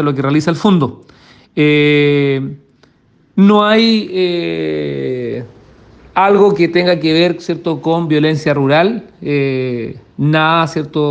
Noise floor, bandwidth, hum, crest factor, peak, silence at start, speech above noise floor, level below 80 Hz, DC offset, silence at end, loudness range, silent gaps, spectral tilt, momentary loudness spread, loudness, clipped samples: -52 dBFS; 8.8 kHz; none; 14 dB; 0 dBFS; 0 s; 39 dB; -54 dBFS; under 0.1%; 0 s; 2 LU; none; -7 dB/octave; 11 LU; -13 LUFS; under 0.1%